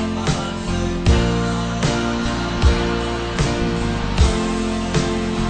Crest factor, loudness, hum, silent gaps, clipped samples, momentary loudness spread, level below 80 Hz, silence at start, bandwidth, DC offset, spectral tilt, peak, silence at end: 16 dB; -20 LUFS; none; none; under 0.1%; 5 LU; -24 dBFS; 0 s; 9.4 kHz; under 0.1%; -5.5 dB/octave; -2 dBFS; 0 s